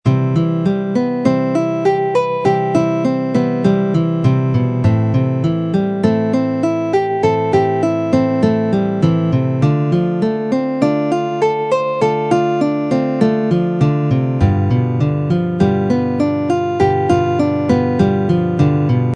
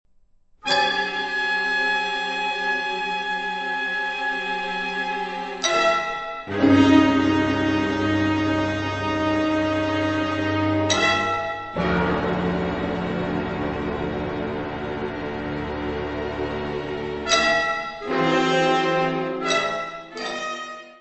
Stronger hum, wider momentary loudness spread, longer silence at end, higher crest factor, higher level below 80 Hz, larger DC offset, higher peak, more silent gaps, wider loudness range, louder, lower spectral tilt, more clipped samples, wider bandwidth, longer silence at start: neither; second, 3 LU vs 10 LU; about the same, 0 s vs 0.05 s; second, 14 dB vs 20 dB; about the same, -42 dBFS vs -46 dBFS; neither; first, 0 dBFS vs -4 dBFS; neither; second, 1 LU vs 7 LU; first, -16 LUFS vs -23 LUFS; first, -8.5 dB/octave vs -4.5 dB/octave; neither; first, 9.6 kHz vs 8.4 kHz; second, 0.05 s vs 0.65 s